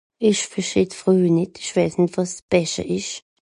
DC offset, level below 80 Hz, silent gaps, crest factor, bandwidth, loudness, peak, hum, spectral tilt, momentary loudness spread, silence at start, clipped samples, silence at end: under 0.1%; -52 dBFS; 2.42-2.48 s; 18 dB; 11 kHz; -21 LUFS; -4 dBFS; none; -5 dB/octave; 8 LU; 0.2 s; under 0.1%; 0.3 s